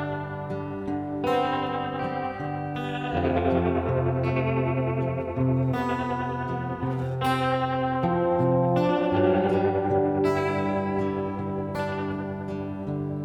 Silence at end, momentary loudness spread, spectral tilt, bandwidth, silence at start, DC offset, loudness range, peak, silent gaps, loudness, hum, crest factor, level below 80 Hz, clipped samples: 0 s; 9 LU; -8 dB/octave; 12.5 kHz; 0 s; under 0.1%; 4 LU; -10 dBFS; none; -26 LUFS; none; 16 dB; -50 dBFS; under 0.1%